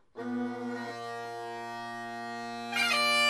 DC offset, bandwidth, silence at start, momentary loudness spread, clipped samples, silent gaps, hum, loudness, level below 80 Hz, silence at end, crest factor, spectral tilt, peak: under 0.1%; 15.5 kHz; 0.15 s; 13 LU; under 0.1%; none; none; -33 LUFS; -78 dBFS; 0 s; 18 dB; -2 dB/octave; -14 dBFS